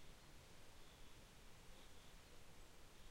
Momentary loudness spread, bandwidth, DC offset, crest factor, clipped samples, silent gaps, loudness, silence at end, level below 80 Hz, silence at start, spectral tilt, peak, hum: 1 LU; 16 kHz; under 0.1%; 12 dB; under 0.1%; none; -65 LUFS; 0 s; -66 dBFS; 0 s; -3 dB/octave; -48 dBFS; none